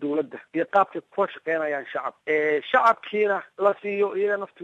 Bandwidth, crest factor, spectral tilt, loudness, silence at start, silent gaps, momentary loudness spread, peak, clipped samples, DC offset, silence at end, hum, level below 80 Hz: 7.8 kHz; 18 dB; -6 dB/octave; -24 LUFS; 0 s; none; 9 LU; -6 dBFS; under 0.1%; under 0.1%; 0 s; none; -76 dBFS